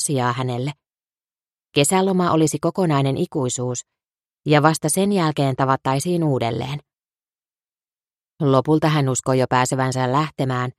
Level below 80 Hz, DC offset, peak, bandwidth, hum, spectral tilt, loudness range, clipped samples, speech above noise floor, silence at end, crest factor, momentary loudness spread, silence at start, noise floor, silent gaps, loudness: -58 dBFS; under 0.1%; -2 dBFS; 14.5 kHz; none; -5 dB/octave; 3 LU; under 0.1%; over 71 dB; 0.05 s; 20 dB; 8 LU; 0 s; under -90 dBFS; 4.26-4.30 s; -20 LUFS